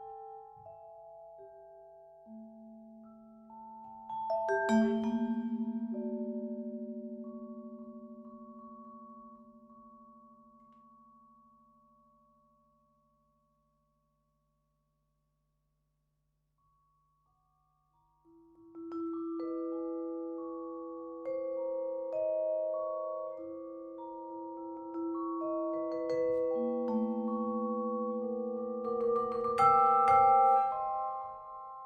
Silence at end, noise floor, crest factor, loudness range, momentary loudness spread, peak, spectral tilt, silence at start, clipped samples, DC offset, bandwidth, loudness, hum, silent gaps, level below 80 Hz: 0 s; -79 dBFS; 22 dB; 24 LU; 25 LU; -14 dBFS; -7 dB/octave; 0 s; under 0.1%; under 0.1%; 9.4 kHz; -33 LUFS; none; none; -74 dBFS